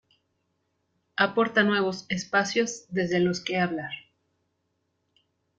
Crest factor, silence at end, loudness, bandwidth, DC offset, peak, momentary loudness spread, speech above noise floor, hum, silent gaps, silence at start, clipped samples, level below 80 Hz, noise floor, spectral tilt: 22 dB; 1.6 s; -26 LUFS; 9 kHz; under 0.1%; -6 dBFS; 11 LU; 50 dB; none; none; 1.15 s; under 0.1%; -68 dBFS; -76 dBFS; -4.5 dB/octave